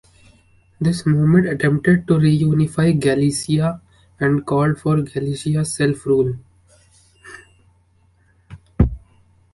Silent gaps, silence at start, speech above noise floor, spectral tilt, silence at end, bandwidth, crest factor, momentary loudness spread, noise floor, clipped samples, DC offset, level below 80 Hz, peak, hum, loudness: none; 0.8 s; 40 dB; -7 dB/octave; 0.55 s; 11.5 kHz; 18 dB; 8 LU; -57 dBFS; under 0.1%; under 0.1%; -36 dBFS; -2 dBFS; none; -18 LUFS